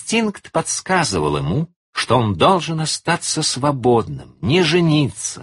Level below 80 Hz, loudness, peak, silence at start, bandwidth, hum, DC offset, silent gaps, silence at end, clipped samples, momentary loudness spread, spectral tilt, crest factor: -46 dBFS; -18 LUFS; 0 dBFS; 0 s; 11.5 kHz; none; under 0.1%; 1.76-1.93 s; 0 s; under 0.1%; 8 LU; -4.5 dB/octave; 18 dB